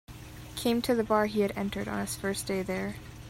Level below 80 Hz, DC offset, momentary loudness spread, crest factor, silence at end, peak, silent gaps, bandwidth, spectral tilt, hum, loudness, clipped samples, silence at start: -52 dBFS; under 0.1%; 12 LU; 18 dB; 0 s; -12 dBFS; none; 16 kHz; -4.5 dB/octave; none; -30 LUFS; under 0.1%; 0.1 s